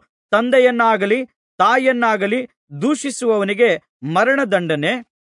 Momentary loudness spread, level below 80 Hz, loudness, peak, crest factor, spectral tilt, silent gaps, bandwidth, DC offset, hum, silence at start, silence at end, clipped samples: 8 LU; -72 dBFS; -17 LUFS; -2 dBFS; 14 dB; -4.5 dB/octave; 1.36-1.58 s, 2.57-2.67 s, 3.89-4.00 s; 11 kHz; under 0.1%; none; 0.3 s; 0.2 s; under 0.1%